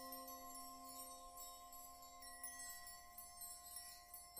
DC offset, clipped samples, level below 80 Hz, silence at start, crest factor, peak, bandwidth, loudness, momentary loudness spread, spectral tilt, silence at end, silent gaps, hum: under 0.1%; under 0.1%; -72 dBFS; 0 s; 34 dB; -20 dBFS; 15 kHz; -54 LUFS; 5 LU; -0.5 dB/octave; 0 s; none; none